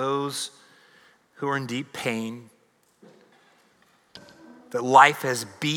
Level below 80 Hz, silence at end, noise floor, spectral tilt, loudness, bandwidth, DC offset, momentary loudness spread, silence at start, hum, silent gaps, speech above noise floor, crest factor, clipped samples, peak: -80 dBFS; 0 s; -63 dBFS; -3.5 dB/octave; -23 LUFS; 19.5 kHz; under 0.1%; 18 LU; 0 s; none; none; 40 dB; 24 dB; under 0.1%; -2 dBFS